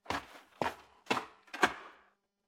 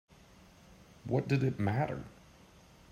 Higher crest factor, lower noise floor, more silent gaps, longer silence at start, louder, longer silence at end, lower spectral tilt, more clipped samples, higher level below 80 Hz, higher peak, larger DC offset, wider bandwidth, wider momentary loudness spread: first, 30 dB vs 18 dB; first, -70 dBFS vs -59 dBFS; neither; second, 0.05 s vs 0.7 s; second, -36 LUFS vs -33 LUFS; second, 0.55 s vs 0.8 s; second, -3 dB/octave vs -8 dB/octave; neither; about the same, -66 dBFS vs -62 dBFS; first, -10 dBFS vs -18 dBFS; neither; first, 16.5 kHz vs 9.6 kHz; first, 22 LU vs 17 LU